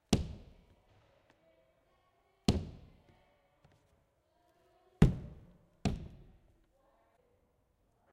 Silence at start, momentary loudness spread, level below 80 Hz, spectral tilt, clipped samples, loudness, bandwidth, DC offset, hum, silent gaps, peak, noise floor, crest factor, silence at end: 0.1 s; 24 LU; -48 dBFS; -6.5 dB/octave; under 0.1%; -35 LUFS; 14.5 kHz; under 0.1%; none; none; -8 dBFS; -74 dBFS; 32 dB; 2 s